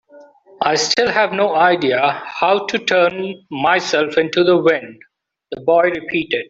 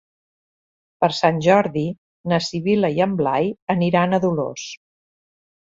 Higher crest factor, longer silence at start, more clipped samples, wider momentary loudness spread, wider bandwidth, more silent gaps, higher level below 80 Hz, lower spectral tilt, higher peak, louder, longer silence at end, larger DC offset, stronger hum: about the same, 16 dB vs 18 dB; second, 0.15 s vs 1 s; neither; second, 7 LU vs 12 LU; about the same, 8 kHz vs 7.8 kHz; second, none vs 1.98-2.24 s, 3.62-3.67 s; about the same, -60 dBFS vs -58 dBFS; second, -3.5 dB/octave vs -6 dB/octave; about the same, 0 dBFS vs -2 dBFS; first, -16 LUFS vs -20 LUFS; second, 0.05 s vs 0.85 s; neither; neither